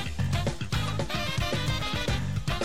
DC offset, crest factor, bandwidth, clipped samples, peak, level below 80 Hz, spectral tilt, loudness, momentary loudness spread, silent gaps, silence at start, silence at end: 1%; 12 dB; 16 kHz; under 0.1%; -16 dBFS; -38 dBFS; -5 dB/octave; -29 LUFS; 2 LU; none; 0 s; 0 s